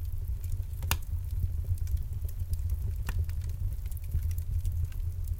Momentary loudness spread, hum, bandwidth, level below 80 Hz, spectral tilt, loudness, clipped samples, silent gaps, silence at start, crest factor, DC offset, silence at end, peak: 4 LU; none; 17 kHz; -34 dBFS; -4.5 dB/octave; -35 LUFS; under 0.1%; none; 0 s; 22 dB; under 0.1%; 0 s; -10 dBFS